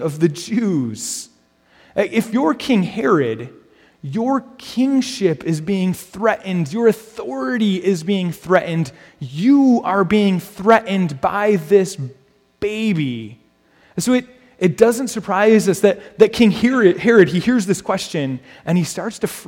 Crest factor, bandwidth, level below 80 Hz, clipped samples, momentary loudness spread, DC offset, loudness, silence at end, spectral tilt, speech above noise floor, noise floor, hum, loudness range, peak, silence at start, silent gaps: 18 dB; 17 kHz; -54 dBFS; under 0.1%; 13 LU; under 0.1%; -17 LUFS; 0.05 s; -6 dB/octave; 37 dB; -54 dBFS; none; 6 LU; 0 dBFS; 0 s; none